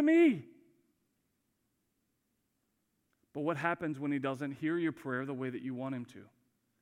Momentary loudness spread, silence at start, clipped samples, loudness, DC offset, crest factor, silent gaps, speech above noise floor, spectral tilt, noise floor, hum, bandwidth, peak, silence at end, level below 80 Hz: 12 LU; 0 s; under 0.1%; -34 LUFS; under 0.1%; 20 dB; none; 47 dB; -7.5 dB/octave; -81 dBFS; none; 10.5 kHz; -16 dBFS; 0.6 s; -84 dBFS